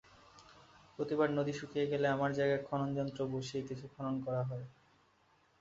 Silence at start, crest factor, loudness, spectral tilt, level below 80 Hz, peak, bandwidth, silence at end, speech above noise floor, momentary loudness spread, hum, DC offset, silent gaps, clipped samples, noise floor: 0.35 s; 18 dB; -36 LUFS; -6 dB/octave; -70 dBFS; -18 dBFS; 7.6 kHz; 0.9 s; 35 dB; 10 LU; none; under 0.1%; none; under 0.1%; -71 dBFS